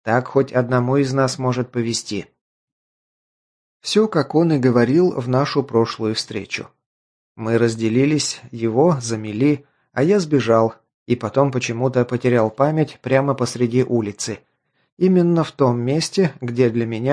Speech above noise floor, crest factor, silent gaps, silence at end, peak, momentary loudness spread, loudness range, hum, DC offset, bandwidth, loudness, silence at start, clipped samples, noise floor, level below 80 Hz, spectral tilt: over 72 dB; 18 dB; 2.41-3.80 s, 6.86-7.35 s, 10.94-11.06 s, 14.92-14.97 s; 0 s; -2 dBFS; 9 LU; 3 LU; none; under 0.1%; 10.5 kHz; -19 LUFS; 0.05 s; under 0.1%; under -90 dBFS; -60 dBFS; -6 dB/octave